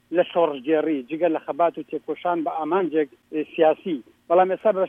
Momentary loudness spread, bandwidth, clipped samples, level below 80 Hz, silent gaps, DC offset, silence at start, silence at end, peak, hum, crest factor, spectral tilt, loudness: 10 LU; 3.8 kHz; under 0.1%; -76 dBFS; none; under 0.1%; 0.1 s; 0 s; -6 dBFS; none; 16 dB; -8 dB/octave; -23 LUFS